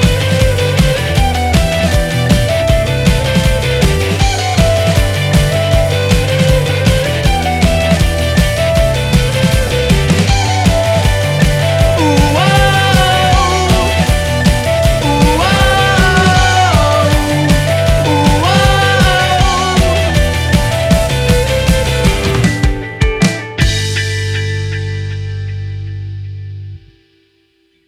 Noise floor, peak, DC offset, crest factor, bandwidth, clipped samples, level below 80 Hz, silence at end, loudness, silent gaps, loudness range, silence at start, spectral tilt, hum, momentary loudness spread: -56 dBFS; 0 dBFS; under 0.1%; 10 dB; 16 kHz; under 0.1%; -18 dBFS; 1.1 s; -12 LUFS; none; 5 LU; 0 s; -5 dB/octave; 50 Hz at -30 dBFS; 7 LU